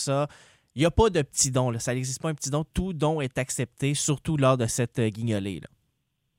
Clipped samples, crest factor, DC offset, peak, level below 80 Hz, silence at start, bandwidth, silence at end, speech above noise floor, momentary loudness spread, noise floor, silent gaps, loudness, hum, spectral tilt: under 0.1%; 18 dB; under 0.1%; -8 dBFS; -44 dBFS; 0 s; 16 kHz; 0.75 s; 50 dB; 8 LU; -76 dBFS; none; -26 LUFS; none; -5 dB/octave